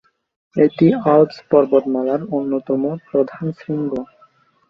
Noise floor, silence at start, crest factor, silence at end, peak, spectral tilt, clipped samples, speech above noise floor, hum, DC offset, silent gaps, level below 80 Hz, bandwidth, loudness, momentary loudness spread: -54 dBFS; 0.55 s; 16 dB; 0.65 s; -2 dBFS; -10 dB/octave; under 0.1%; 37 dB; none; under 0.1%; none; -60 dBFS; 6 kHz; -18 LUFS; 11 LU